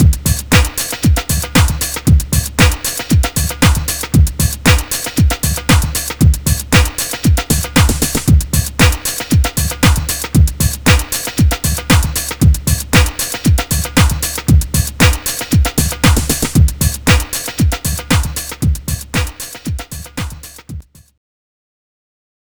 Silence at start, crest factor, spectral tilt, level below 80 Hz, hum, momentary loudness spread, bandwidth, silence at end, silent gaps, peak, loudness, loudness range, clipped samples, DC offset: 0 s; 14 dB; -4 dB/octave; -18 dBFS; none; 7 LU; over 20 kHz; 1.65 s; none; 0 dBFS; -14 LUFS; 5 LU; 0.2%; 0.7%